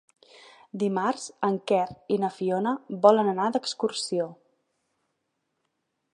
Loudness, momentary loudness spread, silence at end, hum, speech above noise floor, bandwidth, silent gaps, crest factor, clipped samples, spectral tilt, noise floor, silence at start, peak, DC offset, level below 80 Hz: -26 LUFS; 9 LU; 1.8 s; none; 53 dB; 11 kHz; none; 24 dB; under 0.1%; -5 dB/octave; -78 dBFS; 0.75 s; -4 dBFS; under 0.1%; -74 dBFS